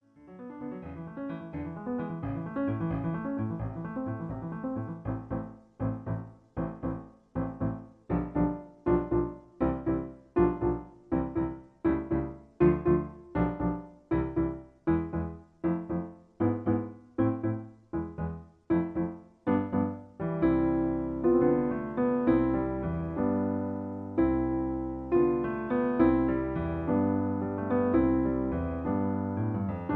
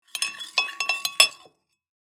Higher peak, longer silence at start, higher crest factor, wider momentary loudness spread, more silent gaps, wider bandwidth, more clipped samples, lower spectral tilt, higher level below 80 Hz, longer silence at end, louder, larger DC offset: second, -10 dBFS vs -2 dBFS; about the same, 0.2 s vs 0.15 s; second, 18 dB vs 26 dB; first, 12 LU vs 9 LU; neither; second, 4 kHz vs 19.5 kHz; neither; first, -11.5 dB/octave vs 3.5 dB/octave; first, -46 dBFS vs -82 dBFS; second, 0 s vs 0.8 s; second, -31 LUFS vs -22 LUFS; neither